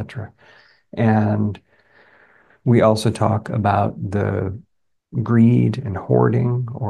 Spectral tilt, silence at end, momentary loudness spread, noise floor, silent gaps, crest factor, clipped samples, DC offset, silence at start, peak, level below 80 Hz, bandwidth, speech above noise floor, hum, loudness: -8 dB/octave; 0 s; 16 LU; -53 dBFS; none; 18 dB; under 0.1%; under 0.1%; 0 s; -2 dBFS; -54 dBFS; 12 kHz; 35 dB; none; -19 LUFS